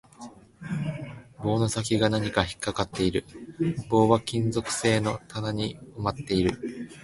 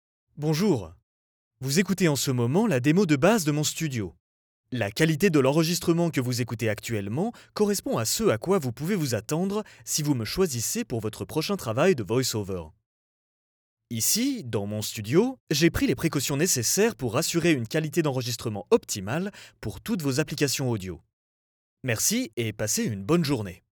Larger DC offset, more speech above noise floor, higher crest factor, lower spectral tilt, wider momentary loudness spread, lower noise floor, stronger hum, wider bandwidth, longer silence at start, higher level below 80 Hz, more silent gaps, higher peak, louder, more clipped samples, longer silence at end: neither; second, 20 dB vs over 65 dB; about the same, 22 dB vs 18 dB; about the same, -5.5 dB/octave vs -4.5 dB/octave; first, 14 LU vs 9 LU; second, -47 dBFS vs under -90 dBFS; neither; second, 11.5 kHz vs over 20 kHz; second, 0.2 s vs 0.35 s; first, -48 dBFS vs -56 dBFS; second, none vs 1.03-1.51 s, 4.20-4.64 s, 12.86-13.77 s, 15.40-15.47 s, 21.13-21.77 s, 22.33-22.37 s; first, -4 dBFS vs -8 dBFS; about the same, -27 LUFS vs -25 LUFS; neither; second, 0 s vs 0.15 s